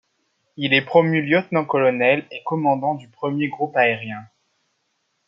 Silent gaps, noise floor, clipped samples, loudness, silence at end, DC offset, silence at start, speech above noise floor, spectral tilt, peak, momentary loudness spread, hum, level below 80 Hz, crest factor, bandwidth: none; -71 dBFS; under 0.1%; -20 LUFS; 1 s; under 0.1%; 0.6 s; 51 dB; -8 dB/octave; -2 dBFS; 10 LU; none; -70 dBFS; 20 dB; 5.6 kHz